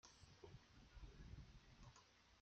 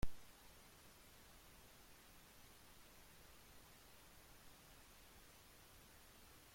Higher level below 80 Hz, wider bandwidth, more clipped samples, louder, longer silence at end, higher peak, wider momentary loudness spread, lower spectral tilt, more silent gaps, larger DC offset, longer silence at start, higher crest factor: second, -68 dBFS vs -62 dBFS; second, 8.4 kHz vs 16.5 kHz; neither; about the same, -65 LUFS vs -63 LUFS; about the same, 0 s vs 0 s; second, -46 dBFS vs -28 dBFS; first, 5 LU vs 0 LU; about the same, -4.5 dB/octave vs -3.5 dB/octave; neither; neither; about the same, 0.05 s vs 0 s; second, 16 dB vs 24 dB